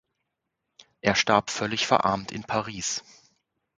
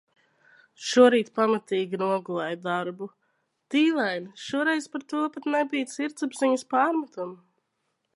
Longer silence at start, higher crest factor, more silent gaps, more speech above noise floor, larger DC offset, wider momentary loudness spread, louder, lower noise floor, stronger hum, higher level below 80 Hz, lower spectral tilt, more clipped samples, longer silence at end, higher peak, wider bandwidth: first, 1.05 s vs 0.8 s; about the same, 24 dB vs 22 dB; neither; first, 56 dB vs 52 dB; neither; second, 8 LU vs 15 LU; about the same, -25 LUFS vs -26 LUFS; first, -82 dBFS vs -77 dBFS; neither; first, -58 dBFS vs -80 dBFS; second, -3 dB/octave vs -4.5 dB/octave; neither; about the same, 0.75 s vs 0.8 s; about the same, -4 dBFS vs -6 dBFS; second, 9.6 kHz vs 11.5 kHz